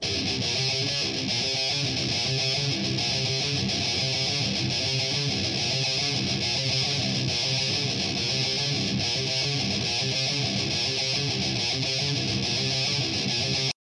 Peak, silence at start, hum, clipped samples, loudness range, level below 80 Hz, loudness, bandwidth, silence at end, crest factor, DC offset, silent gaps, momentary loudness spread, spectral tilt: -14 dBFS; 0 s; none; under 0.1%; 0 LU; -54 dBFS; -24 LUFS; 11 kHz; 0.1 s; 12 dB; under 0.1%; none; 1 LU; -3 dB/octave